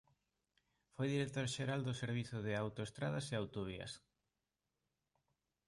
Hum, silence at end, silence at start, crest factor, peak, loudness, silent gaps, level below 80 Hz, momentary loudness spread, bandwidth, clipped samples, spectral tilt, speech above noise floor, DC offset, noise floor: none; 1.7 s; 1 s; 18 dB; -26 dBFS; -42 LUFS; none; -70 dBFS; 9 LU; 11.5 kHz; under 0.1%; -5.5 dB/octave; over 49 dB; under 0.1%; under -90 dBFS